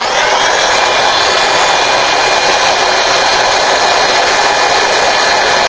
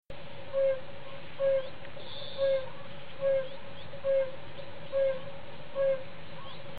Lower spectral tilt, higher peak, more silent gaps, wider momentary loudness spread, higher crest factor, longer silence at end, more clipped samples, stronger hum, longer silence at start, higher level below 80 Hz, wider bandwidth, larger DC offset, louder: second, -0.5 dB/octave vs -8 dB/octave; first, 0 dBFS vs -20 dBFS; neither; second, 0 LU vs 16 LU; about the same, 10 dB vs 12 dB; about the same, 0 s vs 0 s; first, 0.2% vs under 0.1%; neither; about the same, 0 s vs 0 s; first, -40 dBFS vs -62 dBFS; first, 8 kHz vs 4.8 kHz; second, under 0.1% vs 2%; first, -9 LUFS vs -32 LUFS